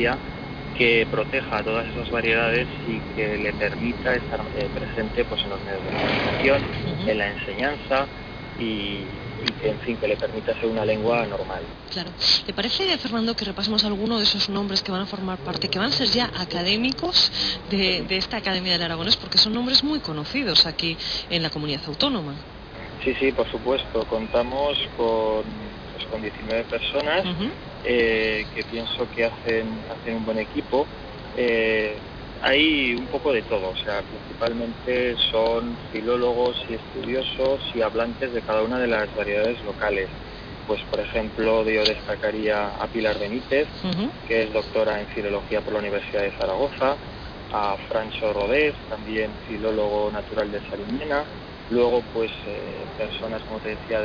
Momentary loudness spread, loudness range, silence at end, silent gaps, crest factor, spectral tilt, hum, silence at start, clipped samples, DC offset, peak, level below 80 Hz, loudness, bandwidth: 11 LU; 5 LU; 0 s; none; 22 dB; -5 dB/octave; none; 0 s; under 0.1%; under 0.1%; -4 dBFS; -44 dBFS; -23 LUFS; 5.4 kHz